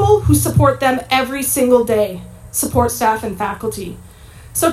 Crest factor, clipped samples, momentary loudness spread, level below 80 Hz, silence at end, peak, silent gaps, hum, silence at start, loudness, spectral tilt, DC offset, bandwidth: 16 dB; under 0.1%; 11 LU; -38 dBFS; 0 s; 0 dBFS; none; none; 0 s; -16 LUFS; -5 dB/octave; under 0.1%; 16 kHz